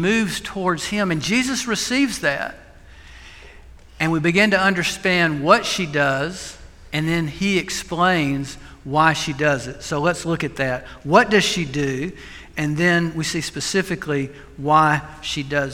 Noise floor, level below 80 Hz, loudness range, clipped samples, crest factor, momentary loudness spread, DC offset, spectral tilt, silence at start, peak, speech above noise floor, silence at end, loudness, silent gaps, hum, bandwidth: -43 dBFS; -46 dBFS; 4 LU; under 0.1%; 20 dB; 11 LU; under 0.1%; -4.5 dB/octave; 0 s; 0 dBFS; 23 dB; 0 s; -20 LUFS; none; none; 16.5 kHz